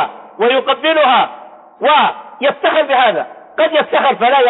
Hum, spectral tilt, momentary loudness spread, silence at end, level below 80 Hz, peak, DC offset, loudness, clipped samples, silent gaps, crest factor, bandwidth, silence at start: none; -8 dB/octave; 7 LU; 0 s; -68 dBFS; -2 dBFS; under 0.1%; -13 LUFS; under 0.1%; none; 10 dB; 4.1 kHz; 0 s